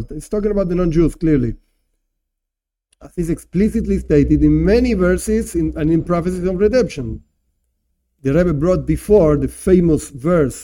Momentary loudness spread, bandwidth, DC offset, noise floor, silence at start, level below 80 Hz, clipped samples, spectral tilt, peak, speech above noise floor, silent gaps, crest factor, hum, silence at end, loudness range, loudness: 10 LU; 16.5 kHz; under 0.1%; -82 dBFS; 0 s; -30 dBFS; under 0.1%; -7.5 dB/octave; -2 dBFS; 66 dB; none; 16 dB; none; 0 s; 5 LU; -16 LUFS